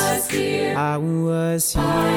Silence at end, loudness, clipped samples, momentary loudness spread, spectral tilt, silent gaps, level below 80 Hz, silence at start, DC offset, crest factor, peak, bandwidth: 0 s; -21 LUFS; under 0.1%; 2 LU; -4.5 dB/octave; none; -38 dBFS; 0 s; under 0.1%; 12 dB; -8 dBFS; over 20 kHz